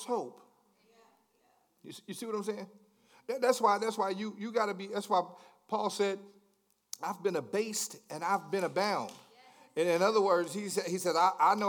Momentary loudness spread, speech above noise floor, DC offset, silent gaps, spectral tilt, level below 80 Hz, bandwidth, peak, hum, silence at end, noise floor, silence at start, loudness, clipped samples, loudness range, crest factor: 16 LU; 41 dB; under 0.1%; none; -3.5 dB/octave; under -90 dBFS; 19 kHz; -12 dBFS; none; 0 s; -73 dBFS; 0 s; -32 LUFS; under 0.1%; 4 LU; 20 dB